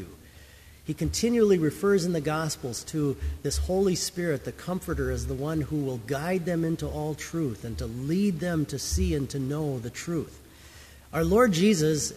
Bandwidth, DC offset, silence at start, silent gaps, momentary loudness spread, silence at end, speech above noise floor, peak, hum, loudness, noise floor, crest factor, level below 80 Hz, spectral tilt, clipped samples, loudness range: 15.5 kHz; under 0.1%; 0 s; none; 11 LU; 0 s; 24 dB; -8 dBFS; none; -27 LUFS; -50 dBFS; 18 dB; -40 dBFS; -5.5 dB/octave; under 0.1%; 4 LU